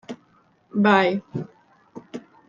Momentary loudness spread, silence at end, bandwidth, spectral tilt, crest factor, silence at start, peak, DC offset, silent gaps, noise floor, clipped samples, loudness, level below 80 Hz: 23 LU; 0.3 s; 7.2 kHz; -7 dB/octave; 22 dB; 0.1 s; -2 dBFS; under 0.1%; none; -60 dBFS; under 0.1%; -21 LUFS; -68 dBFS